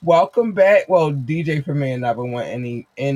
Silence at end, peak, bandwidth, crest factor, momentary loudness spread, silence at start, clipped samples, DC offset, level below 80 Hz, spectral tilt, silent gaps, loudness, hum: 0 s; -2 dBFS; 11.5 kHz; 14 dB; 12 LU; 0 s; under 0.1%; under 0.1%; -60 dBFS; -7.5 dB/octave; none; -18 LUFS; none